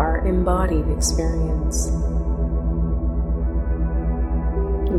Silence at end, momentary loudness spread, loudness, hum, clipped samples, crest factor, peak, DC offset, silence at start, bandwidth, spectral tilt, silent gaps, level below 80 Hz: 0 s; 4 LU; -23 LUFS; none; under 0.1%; 14 dB; -6 dBFS; under 0.1%; 0 s; 12.5 kHz; -6 dB/octave; none; -22 dBFS